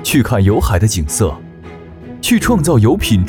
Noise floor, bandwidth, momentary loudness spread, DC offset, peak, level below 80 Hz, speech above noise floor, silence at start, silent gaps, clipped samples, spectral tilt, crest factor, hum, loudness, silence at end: -33 dBFS; 18.5 kHz; 22 LU; under 0.1%; -2 dBFS; -28 dBFS; 21 dB; 0 s; none; under 0.1%; -5.5 dB/octave; 12 dB; none; -13 LUFS; 0 s